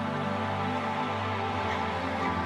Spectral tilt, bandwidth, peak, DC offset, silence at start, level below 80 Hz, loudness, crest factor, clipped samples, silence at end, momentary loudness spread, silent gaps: -6 dB/octave; 12 kHz; -18 dBFS; under 0.1%; 0 s; -56 dBFS; -30 LUFS; 12 dB; under 0.1%; 0 s; 1 LU; none